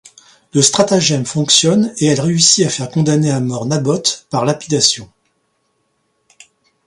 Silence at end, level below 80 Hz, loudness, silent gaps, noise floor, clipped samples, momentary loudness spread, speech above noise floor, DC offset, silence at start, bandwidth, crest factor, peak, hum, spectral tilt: 1.8 s; -54 dBFS; -13 LUFS; none; -65 dBFS; under 0.1%; 8 LU; 51 dB; under 0.1%; 0.55 s; 11.5 kHz; 16 dB; 0 dBFS; none; -3.5 dB/octave